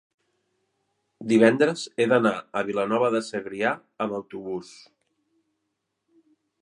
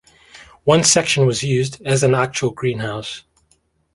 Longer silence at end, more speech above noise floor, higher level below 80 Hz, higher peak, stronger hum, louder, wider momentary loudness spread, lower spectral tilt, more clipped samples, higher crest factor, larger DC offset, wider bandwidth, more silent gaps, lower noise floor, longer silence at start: first, 1.95 s vs 0.75 s; first, 55 dB vs 44 dB; second, -72 dBFS vs -52 dBFS; about the same, -2 dBFS vs 0 dBFS; neither; second, -24 LUFS vs -17 LUFS; about the same, 15 LU vs 13 LU; first, -5.5 dB/octave vs -4 dB/octave; neither; first, 24 dB vs 18 dB; neither; about the same, 11 kHz vs 11.5 kHz; neither; first, -79 dBFS vs -62 dBFS; first, 1.2 s vs 0.35 s